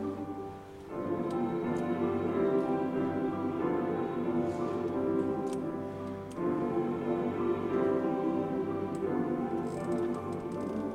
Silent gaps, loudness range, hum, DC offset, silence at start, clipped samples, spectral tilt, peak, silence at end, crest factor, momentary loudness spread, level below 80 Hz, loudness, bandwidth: none; 2 LU; none; under 0.1%; 0 s; under 0.1%; -8 dB/octave; -18 dBFS; 0 s; 14 dB; 8 LU; -64 dBFS; -33 LUFS; 11 kHz